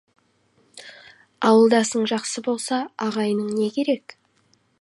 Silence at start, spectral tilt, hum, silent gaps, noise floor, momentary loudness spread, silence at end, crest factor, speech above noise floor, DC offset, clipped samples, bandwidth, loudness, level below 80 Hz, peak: 0.75 s; -4 dB/octave; none; none; -63 dBFS; 23 LU; 0.8 s; 20 dB; 43 dB; under 0.1%; under 0.1%; 11.5 kHz; -21 LUFS; -76 dBFS; -4 dBFS